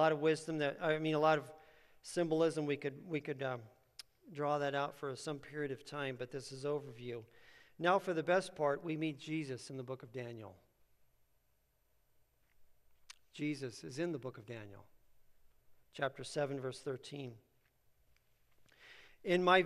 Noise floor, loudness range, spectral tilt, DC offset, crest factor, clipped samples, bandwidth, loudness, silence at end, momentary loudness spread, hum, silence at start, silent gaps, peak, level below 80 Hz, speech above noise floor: -77 dBFS; 11 LU; -5.5 dB/octave; under 0.1%; 26 dB; under 0.1%; 13 kHz; -38 LUFS; 0 s; 21 LU; none; 0 s; none; -14 dBFS; -76 dBFS; 40 dB